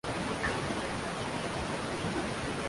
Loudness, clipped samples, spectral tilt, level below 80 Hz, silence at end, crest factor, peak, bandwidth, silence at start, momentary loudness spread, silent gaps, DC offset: -34 LUFS; under 0.1%; -4.5 dB/octave; -50 dBFS; 0 s; 16 dB; -18 dBFS; 11.5 kHz; 0.05 s; 3 LU; none; under 0.1%